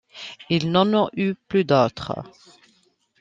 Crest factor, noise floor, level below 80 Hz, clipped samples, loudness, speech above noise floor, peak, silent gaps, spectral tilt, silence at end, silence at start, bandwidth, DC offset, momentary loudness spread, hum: 20 dB; -63 dBFS; -60 dBFS; under 0.1%; -21 LUFS; 42 dB; -4 dBFS; none; -7 dB/octave; 0.9 s; 0.15 s; 7.6 kHz; under 0.1%; 15 LU; none